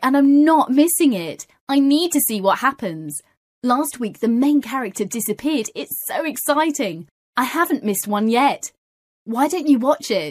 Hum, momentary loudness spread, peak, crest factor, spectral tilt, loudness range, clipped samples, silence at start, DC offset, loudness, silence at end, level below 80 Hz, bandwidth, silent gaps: none; 13 LU; -4 dBFS; 16 dB; -3.5 dB/octave; 4 LU; under 0.1%; 0 s; under 0.1%; -19 LUFS; 0 s; -66 dBFS; 15.5 kHz; 1.61-1.67 s, 3.37-3.62 s, 7.11-7.33 s, 8.78-9.26 s